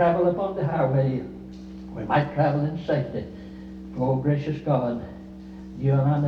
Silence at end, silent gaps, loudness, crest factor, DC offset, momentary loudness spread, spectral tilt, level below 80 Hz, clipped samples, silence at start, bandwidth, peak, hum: 0 s; none; -25 LUFS; 16 dB; under 0.1%; 18 LU; -10 dB/octave; -50 dBFS; under 0.1%; 0 s; 5.6 kHz; -10 dBFS; none